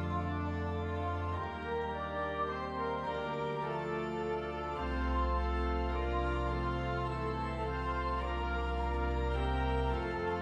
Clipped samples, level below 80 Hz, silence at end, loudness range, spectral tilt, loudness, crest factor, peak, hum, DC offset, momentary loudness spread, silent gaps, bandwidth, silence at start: under 0.1%; -40 dBFS; 0 s; 2 LU; -7.5 dB/octave; -36 LUFS; 12 dB; -22 dBFS; none; under 0.1%; 3 LU; none; 8.4 kHz; 0 s